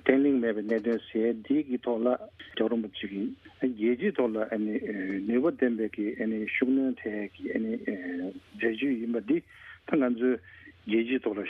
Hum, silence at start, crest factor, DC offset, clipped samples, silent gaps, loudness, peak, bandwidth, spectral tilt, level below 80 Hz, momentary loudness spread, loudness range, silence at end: none; 0.05 s; 20 dB; under 0.1%; under 0.1%; none; -29 LUFS; -8 dBFS; 4.6 kHz; -8.5 dB/octave; -68 dBFS; 9 LU; 2 LU; 0 s